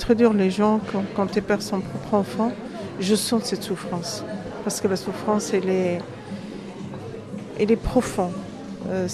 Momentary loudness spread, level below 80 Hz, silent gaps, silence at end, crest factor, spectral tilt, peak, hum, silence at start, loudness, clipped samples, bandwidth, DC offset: 15 LU; -46 dBFS; none; 0 s; 20 dB; -5.5 dB/octave; -4 dBFS; none; 0 s; -24 LUFS; under 0.1%; 13.5 kHz; under 0.1%